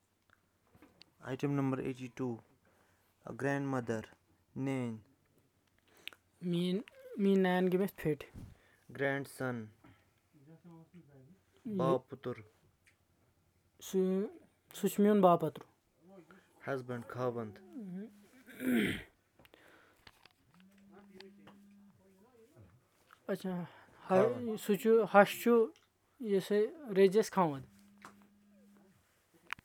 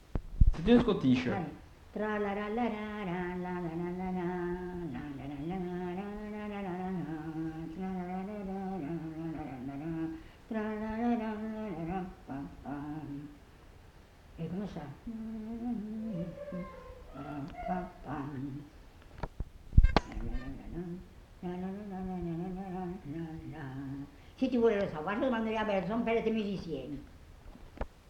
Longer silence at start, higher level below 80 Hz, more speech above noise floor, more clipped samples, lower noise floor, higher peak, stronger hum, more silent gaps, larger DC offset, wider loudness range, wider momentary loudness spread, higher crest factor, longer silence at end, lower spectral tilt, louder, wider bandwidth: first, 1.25 s vs 0 s; second, -72 dBFS vs -40 dBFS; first, 40 dB vs 24 dB; neither; first, -73 dBFS vs -56 dBFS; about the same, -10 dBFS vs -8 dBFS; neither; neither; neither; about the same, 11 LU vs 9 LU; first, 23 LU vs 16 LU; about the same, 26 dB vs 28 dB; first, 1.55 s vs 0 s; second, -6.5 dB/octave vs -8 dB/octave; about the same, -34 LUFS vs -36 LUFS; first, 18.5 kHz vs 9 kHz